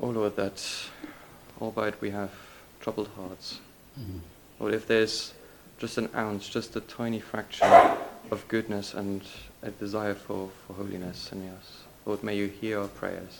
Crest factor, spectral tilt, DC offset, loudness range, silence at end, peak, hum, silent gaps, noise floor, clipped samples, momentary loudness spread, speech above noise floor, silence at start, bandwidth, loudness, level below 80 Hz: 28 dB; -5 dB/octave; under 0.1%; 11 LU; 0 s; -2 dBFS; none; none; -49 dBFS; under 0.1%; 18 LU; 20 dB; 0 s; 18 kHz; -29 LUFS; -60 dBFS